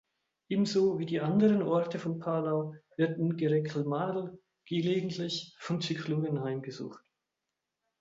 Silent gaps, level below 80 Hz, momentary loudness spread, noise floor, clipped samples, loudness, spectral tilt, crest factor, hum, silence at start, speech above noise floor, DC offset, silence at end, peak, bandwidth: none; -74 dBFS; 11 LU; -87 dBFS; under 0.1%; -31 LUFS; -7 dB/octave; 16 dB; none; 0.5 s; 56 dB; under 0.1%; 1 s; -14 dBFS; 7.8 kHz